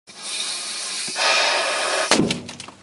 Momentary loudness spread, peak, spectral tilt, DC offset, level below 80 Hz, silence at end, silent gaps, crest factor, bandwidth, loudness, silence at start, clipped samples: 10 LU; 0 dBFS; -1.5 dB/octave; under 0.1%; -58 dBFS; 0.1 s; none; 22 dB; 11.5 kHz; -20 LUFS; 0.1 s; under 0.1%